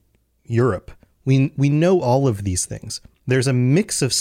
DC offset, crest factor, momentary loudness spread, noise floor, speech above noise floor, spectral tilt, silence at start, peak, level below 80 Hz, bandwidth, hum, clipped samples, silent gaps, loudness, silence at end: under 0.1%; 12 dB; 13 LU; -50 dBFS; 31 dB; -5.5 dB/octave; 0.5 s; -6 dBFS; -48 dBFS; 15.5 kHz; none; under 0.1%; none; -19 LUFS; 0 s